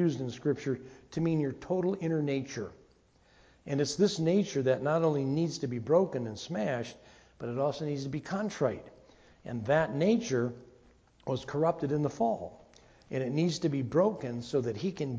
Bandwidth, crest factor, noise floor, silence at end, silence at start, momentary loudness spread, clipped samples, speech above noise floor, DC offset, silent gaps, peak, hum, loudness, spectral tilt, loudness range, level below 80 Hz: 8 kHz; 18 dB; -64 dBFS; 0 s; 0 s; 11 LU; under 0.1%; 34 dB; under 0.1%; none; -12 dBFS; none; -31 LUFS; -6.5 dB/octave; 4 LU; -64 dBFS